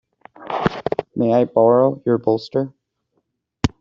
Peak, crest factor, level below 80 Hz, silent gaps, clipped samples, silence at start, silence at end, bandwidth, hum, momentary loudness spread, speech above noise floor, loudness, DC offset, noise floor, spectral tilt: -2 dBFS; 18 dB; -46 dBFS; none; under 0.1%; 0.4 s; 0.15 s; 7.6 kHz; none; 10 LU; 54 dB; -19 LUFS; under 0.1%; -71 dBFS; -7.5 dB/octave